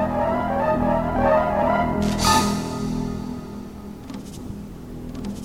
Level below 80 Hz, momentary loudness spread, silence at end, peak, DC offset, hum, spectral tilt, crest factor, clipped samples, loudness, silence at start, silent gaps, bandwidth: -36 dBFS; 17 LU; 0 s; -4 dBFS; 0.2%; none; -5 dB/octave; 18 dB; under 0.1%; -22 LUFS; 0 s; none; 16.5 kHz